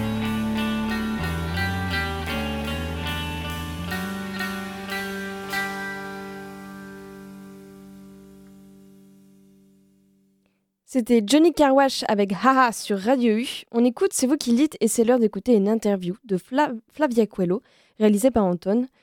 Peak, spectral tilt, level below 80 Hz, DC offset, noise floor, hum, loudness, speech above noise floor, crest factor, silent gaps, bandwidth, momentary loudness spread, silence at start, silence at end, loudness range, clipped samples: -4 dBFS; -5 dB/octave; -44 dBFS; under 0.1%; -69 dBFS; none; -23 LUFS; 49 dB; 20 dB; none; 17.5 kHz; 15 LU; 0 s; 0.15 s; 14 LU; under 0.1%